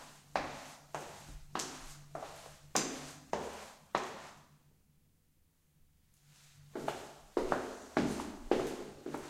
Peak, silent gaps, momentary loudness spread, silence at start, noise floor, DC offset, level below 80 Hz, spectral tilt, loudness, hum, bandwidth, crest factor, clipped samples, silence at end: -12 dBFS; none; 14 LU; 0 s; -71 dBFS; under 0.1%; -60 dBFS; -3.5 dB/octave; -40 LUFS; none; 16 kHz; 30 dB; under 0.1%; 0 s